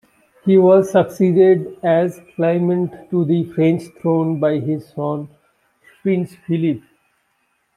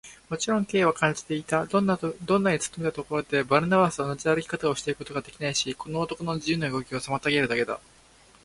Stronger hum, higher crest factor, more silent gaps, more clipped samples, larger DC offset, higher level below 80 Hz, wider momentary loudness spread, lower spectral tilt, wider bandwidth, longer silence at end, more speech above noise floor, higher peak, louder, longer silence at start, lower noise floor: neither; second, 16 dB vs 22 dB; neither; neither; neither; second, -64 dBFS vs -58 dBFS; first, 12 LU vs 8 LU; first, -8.5 dB/octave vs -4.5 dB/octave; about the same, 12.5 kHz vs 11.5 kHz; first, 1 s vs 0.65 s; first, 50 dB vs 30 dB; about the same, -2 dBFS vs -4 dBFS; first, -17 LUFS vs -26 LUFS; first, 0.45 s vs 0.05 s; first, -66 dBFS vs -56 dBFS